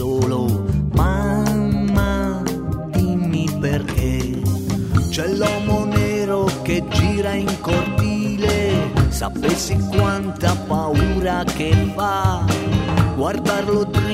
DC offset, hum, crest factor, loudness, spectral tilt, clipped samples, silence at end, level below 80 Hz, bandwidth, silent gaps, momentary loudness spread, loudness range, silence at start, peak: under 0.1%; none; 16 dB; -19 LUFS; -6 dB/octave; under 0.1%; 0 s; -30 dBFS; 16 kHz; none; 3 LU; 1 LU; 0 s; -2 dBFS